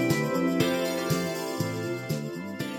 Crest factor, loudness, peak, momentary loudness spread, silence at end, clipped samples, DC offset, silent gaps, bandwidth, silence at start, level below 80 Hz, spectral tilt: 18 dB; -28 LUFS; -10 dBFS; 7 LU; 0 s; under 0.1%; under 0.1%; none; 17 kHz; 0 s; -62 dBFS; -5 dB/octave